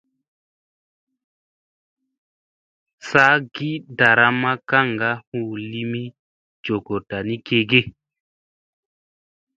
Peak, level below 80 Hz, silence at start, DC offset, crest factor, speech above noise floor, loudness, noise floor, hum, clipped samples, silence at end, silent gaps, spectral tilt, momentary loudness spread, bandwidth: 0 dBFS; -60 dBFS; 3.05 s; under 0.1%; 24 dB; over 70 dB; -19 LUFS; under -90 dBFS; none; under 0.1%; 1.65 s; 5.27-5.32 s, 6.19-6.63 s; -6 dB/octave; 14 LU; 8.8 kHz